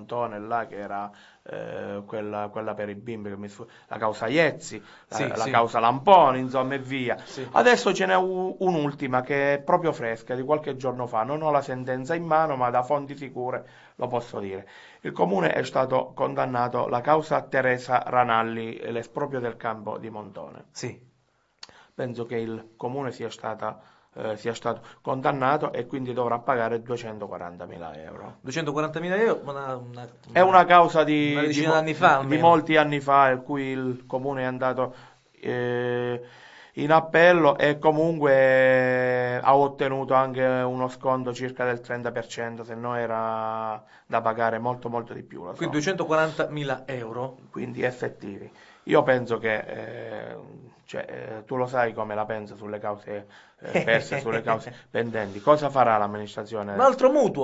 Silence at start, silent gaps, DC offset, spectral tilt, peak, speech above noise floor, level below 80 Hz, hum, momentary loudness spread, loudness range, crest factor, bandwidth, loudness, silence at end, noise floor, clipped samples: 0 s; none; under 0.1%; -6 dB/octave; 0 dBFS; 43 dB; -66 dBFS; none; 17 LU; 11 LU; 24 dB; 8 kHz; -24 LUFS; 0 s; -68 dBFS; under 0.1%